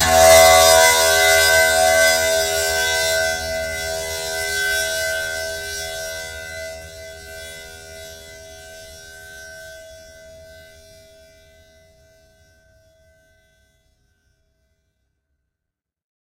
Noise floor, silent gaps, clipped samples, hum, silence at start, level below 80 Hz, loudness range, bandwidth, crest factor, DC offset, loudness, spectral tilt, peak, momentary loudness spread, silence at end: -83 dBFS; none; under 0.1%; none; 0 s; -44 dBFS; 26 LU; 16 kHz; 20 dB; under 0.1%; -15 LUFS; -0.5 dB/octave; 0 dBFS; 28 LU; 6.35 s